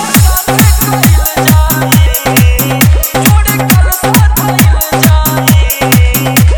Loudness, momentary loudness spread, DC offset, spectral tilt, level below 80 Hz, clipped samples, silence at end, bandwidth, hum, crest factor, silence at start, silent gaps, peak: -8 LUFS; 1 LU; 0.4%; -4.5 dB/octave; -12 dBFS; 2%; 0 s; over 20 kHz; none; 6 dB; 0 s; none; 0 dBFS